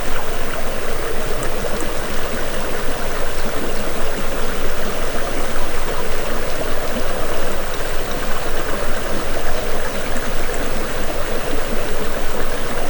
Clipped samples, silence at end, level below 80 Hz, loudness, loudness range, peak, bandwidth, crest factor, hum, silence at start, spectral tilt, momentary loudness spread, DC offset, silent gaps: under 0.1%; 0 s; -20 dBFS; -23 LUFS; 0 LU; -2 dBFS; over 20 kHz; 12 dB; none; 0 s; -4 dB/octave; 1 LU; under 0.1%; none